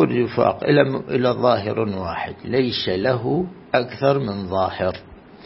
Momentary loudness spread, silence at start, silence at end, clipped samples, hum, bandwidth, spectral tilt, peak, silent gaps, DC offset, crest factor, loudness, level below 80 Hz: 8 LU; 0 s; 0.1 s; under 0.1%; none; 5.8 kHz; -10.5 dB/octave; -2 dBFS; none; under 0.1%; 18 dB; -21 LUFS; -52 dBFS